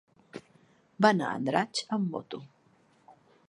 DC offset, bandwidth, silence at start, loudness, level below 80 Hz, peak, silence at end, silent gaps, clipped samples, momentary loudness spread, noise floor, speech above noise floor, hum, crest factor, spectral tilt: under 0.1%; 11 kHz; 0.35 s; -29 LUFS; -78 dBFS; -8 dBFS; 0.35 s; none; under 0.1%; 24 LU; -65 dBFS; 36 dB; none; 24 dB; -5 dB/octave